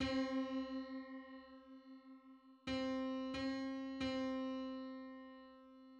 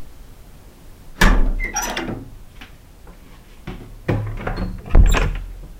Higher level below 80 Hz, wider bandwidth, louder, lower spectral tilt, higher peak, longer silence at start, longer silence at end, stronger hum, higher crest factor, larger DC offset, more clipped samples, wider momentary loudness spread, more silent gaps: second, -68 dBFS vs -22 dBFS; second, 8.2 kHz vs 15.5 kHz; second, -44 LUFS vs -21 LUFS; about the same, -5.5 dB/octave vs -4.5 dB/octave; second, -30 dBFS vs -2 dBFS; about the same, 0 s vs 0 s; about the same, 0 s vs 0.05 s; neither; about the same, 16 dB vs 18 dB; neither; neither; second, 18 LU vs 24 LU; neither